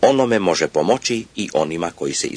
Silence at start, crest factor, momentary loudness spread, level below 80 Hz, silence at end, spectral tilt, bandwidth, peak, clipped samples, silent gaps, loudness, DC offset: 0 s; 16 dB; 7 LU; -54 dBFS; 0 s; -4 dB/octave; 10.5 kHz; -2 dBFS; under 0.1%; none; -19 LUFS; under 0.1%